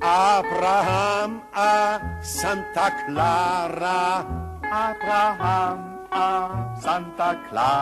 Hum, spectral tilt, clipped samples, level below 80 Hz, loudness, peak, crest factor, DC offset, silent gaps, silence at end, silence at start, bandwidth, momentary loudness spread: none; -4.5 dB/octave; under 0.1%; -46 dBFS; -23 LUFS; -8 dBFS; 14 dB; under 0.1%; none; 0 s; 0 s; 13 kHz; 9 LU